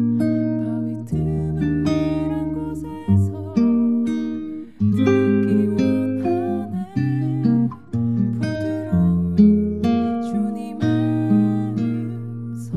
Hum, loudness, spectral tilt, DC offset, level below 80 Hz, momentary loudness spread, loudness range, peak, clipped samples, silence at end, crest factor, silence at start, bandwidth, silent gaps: none; -21 LUFS; -9 dB/octave; 0.5%; -44 dBFS; 9 LU; 3 LU; -4 dBFS; under 0.1%; 0 s; 16 dB; 0 s; 10.5 kHz; none